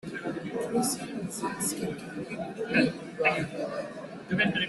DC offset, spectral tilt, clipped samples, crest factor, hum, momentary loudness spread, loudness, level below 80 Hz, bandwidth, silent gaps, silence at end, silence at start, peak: under 0.1%; -4 dB/octave; under 0.1%; 20 dB; none; 11 LU; -30 LUFS; -64 dBFS; 12.5 kHz; none; 0 s; 0.05 s; -10 dBFS